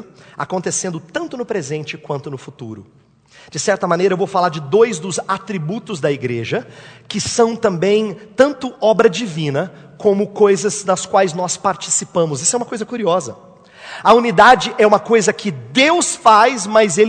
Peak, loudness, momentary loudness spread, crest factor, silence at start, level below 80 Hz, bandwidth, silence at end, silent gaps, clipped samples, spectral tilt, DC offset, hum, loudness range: 0 dBFS; -16 LUFS; 14 LU; 16 dB; 0 s; -56 dBFS; 11 kHz; 0 s; none; 0.1%; -3.5 dB/octave; under 0.1%; none; 8 LU